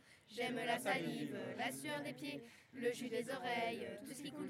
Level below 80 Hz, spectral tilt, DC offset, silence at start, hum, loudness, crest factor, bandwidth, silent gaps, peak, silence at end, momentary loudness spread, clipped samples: -88 dBFS; -4 dB/octave; under 0.1%; 0.05 s; none; -43 LUFS; 18 dB; 16 kHz; none; -24 dBFS; 0 s; 10 LU; under 0.1%